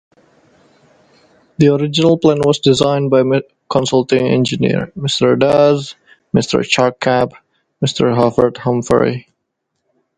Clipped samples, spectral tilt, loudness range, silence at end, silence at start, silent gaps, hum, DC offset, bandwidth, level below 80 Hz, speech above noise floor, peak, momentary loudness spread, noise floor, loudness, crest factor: under 0.1%; -5.5 dB/octave; 2 LU; 0.95 s; 1.6 s; none; none; under 0.1%; 11 kHz; -48 dBFS; 59 dB; 0 dBFS; 7 LU; -72 dBFS; -14 LUFS; 16 dB